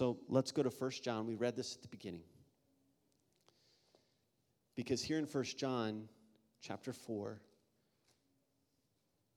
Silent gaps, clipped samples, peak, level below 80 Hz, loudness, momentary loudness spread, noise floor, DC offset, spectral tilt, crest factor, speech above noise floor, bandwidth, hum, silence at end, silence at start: none; under 0.1%; -20 dBFS; -78 dBFS; -41 LUFS; 14 LU; -82 dBFS; under 0.1%; -5 dB/octave; 24 dB; 41 dB; 17 kHz; none; 1.95 s; 0 s